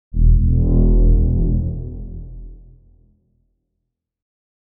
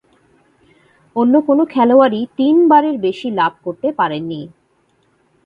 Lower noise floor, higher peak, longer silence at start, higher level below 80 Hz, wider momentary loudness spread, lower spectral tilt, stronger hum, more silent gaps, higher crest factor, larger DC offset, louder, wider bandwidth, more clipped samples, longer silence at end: first, -77 dBFS vs -59 dBFS; about the same, -2 dBFS vs 0 dBFS; second, 0.15 s vs 1.15 s; first, -18 dBFS vs -62 dBFS; first, 20 LU vs 12 LU; first, -17.5 dB/octave vs -8 dB/octave; neither; neither; about the same, 14 dB vs 16 dB; neither; second, -18 LUFS vs -14 LUFS; second, 1.1 kHz vs 5.2 kHz; neither; first, 2.1 s vs 1 s